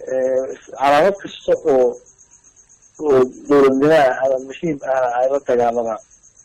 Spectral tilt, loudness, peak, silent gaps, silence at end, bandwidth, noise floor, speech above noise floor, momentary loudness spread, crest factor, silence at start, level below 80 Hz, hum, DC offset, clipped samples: -5.5 dB/octave; -17 LUFS; -8 dBFS; none; 0.45 s; 12.5 kHz; -50 dBFS; 34 dB; 12 LU; 10 dB; 0 s; -54 dBFS; none; under 0.1%; under 0.1%